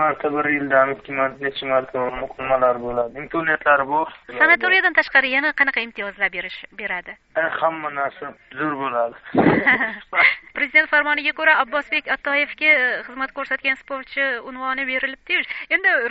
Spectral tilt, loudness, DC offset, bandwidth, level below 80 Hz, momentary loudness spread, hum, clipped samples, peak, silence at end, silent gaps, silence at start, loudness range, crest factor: -1.5 dB/octave; -19 LUFS; under 0.1%; 7.6 kHz; -54 dBFS; 12 LU; none; under 0.1%; -2 dBFS; 0 s; none; 0 s; 5 LU; 20 dB